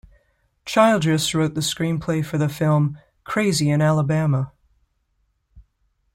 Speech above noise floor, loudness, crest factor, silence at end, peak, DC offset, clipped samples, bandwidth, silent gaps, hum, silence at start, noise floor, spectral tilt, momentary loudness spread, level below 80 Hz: 49 dB; -20 LUFS; 20 dB; 0.55 s; -2 dBFS; under 0.1%; under 0.1%; 16 kHz; none; none; 0.65 s; -69 dBFS; -5.5 dB/octave; 9 LU; -52 dBFS